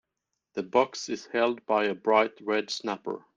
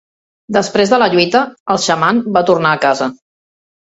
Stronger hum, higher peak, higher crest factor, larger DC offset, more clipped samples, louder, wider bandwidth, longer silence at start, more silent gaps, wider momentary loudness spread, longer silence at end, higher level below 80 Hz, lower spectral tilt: neither; second, -8 dBFS vs 0 dBFS; first, 20 dB vs 14 dB; neither; neither; second, -28 LUFS vs -13 LUFS; first, 9.4 kHz vs 8.2 kHz; about the same, 0.55 s vs 0.5 s; second, none vs 1.60-1.66 s; first, 11 LU vs 7 LU; second, 0.2 s vs 0.65 s; second, -72 dBFS vs -54 dBFS; about the same, -3.5 dB/octave vs -4 dB/octave